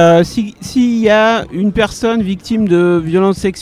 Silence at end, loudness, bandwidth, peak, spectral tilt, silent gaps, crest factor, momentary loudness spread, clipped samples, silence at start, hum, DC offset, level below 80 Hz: 0 s; -13 LUFS; 14 kHz; 0 dBFS; -6 dB/octave; none; 12 dB; 7 LU; 0.2%; 0 s; none; under 0.1%; -38 dBFS